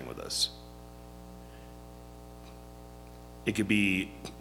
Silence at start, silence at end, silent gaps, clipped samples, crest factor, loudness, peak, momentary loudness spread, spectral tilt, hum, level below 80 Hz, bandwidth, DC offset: 0 s; 0 s; none; under 0.1%; 22 dB; -30 LUFS; -12 dBFS; 23 LU; -3.5 dB/octave; 60 Hz at -50 dBFS; -52 dBFS; 19 kHz; under 0.1%